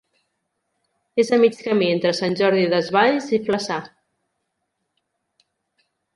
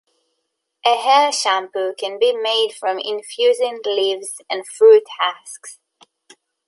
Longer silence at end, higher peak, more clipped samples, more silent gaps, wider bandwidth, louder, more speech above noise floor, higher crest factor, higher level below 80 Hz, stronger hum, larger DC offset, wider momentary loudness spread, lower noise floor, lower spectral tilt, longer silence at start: first, 2.3 s vs 0.95 s; about the same, -4 dBFS vs -2 dBFS; neither; neither; about the same, 11.5 kHz vs 11.5 kHz; second, -20 LUFS vs -17 LUFS; about the same, 57 dB vs 57 dB; about the same, 18 dB vs 16 dB; first, -68 dBFS vs -82 dBFS; neither; neither; second, 7 LU vs 14 LU; about the same, -76 dBFS vs -75 dBFS; first, -5 dB/octave vs 0 dB/octave; first, 1.15 s vs 0.85 s